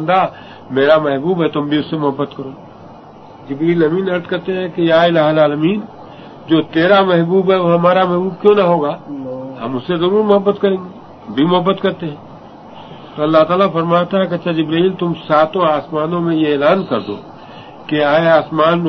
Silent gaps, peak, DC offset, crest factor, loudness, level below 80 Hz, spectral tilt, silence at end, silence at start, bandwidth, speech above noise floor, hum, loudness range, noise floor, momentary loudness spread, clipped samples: none; 0 dBFS; under 0.1%; 14 dB; -14 LUFS; -56 dBFS; -8.5 dB/octave; 0 s; 0 s; 6.2 kHz; 23 dB; none; 4 LU; -37 dBFS; 17 LU; under 0.1%